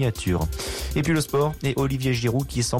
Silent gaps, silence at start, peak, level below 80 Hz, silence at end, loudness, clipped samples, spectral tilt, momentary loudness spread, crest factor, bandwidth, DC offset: none; 0 s; -12 dBFS; -36 dBFS; 0 s; -24 LUFS; under 0.1%; -5.5 dB/octave; 4 LU; 12 dB; 17 kHz; under 0.1%